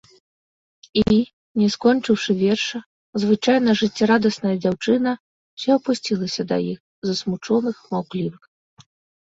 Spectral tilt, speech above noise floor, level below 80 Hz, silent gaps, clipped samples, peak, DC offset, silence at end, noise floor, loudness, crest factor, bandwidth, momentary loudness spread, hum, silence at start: -5.5 dB/octave; over 70 dB; -52 dBFS; 1.33-1.55 s, 2.86-3.13 s, 5.20-5.57 s, 6.80-7.02 s; under 0.1%; -4 dBFS; under 0.1%; 1.05 s; under -90 dBFS; -21 LUFS; 18 dB; 8 kHz; 10 LU; none; 0.95 s